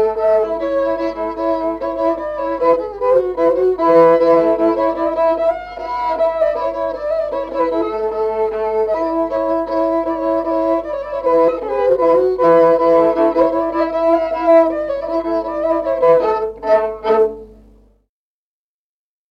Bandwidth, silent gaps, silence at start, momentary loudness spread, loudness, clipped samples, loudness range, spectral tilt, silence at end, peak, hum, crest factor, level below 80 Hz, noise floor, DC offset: 6.4 kHz; none; 0 s; 8 LU; -16 LUFS; under 0.1%; 5 LU; -7.5 dB/octave; 1.8 s; -2 dBFS; none; 14 dB; -46 dBFS; under -90 dBFS; under 0.1%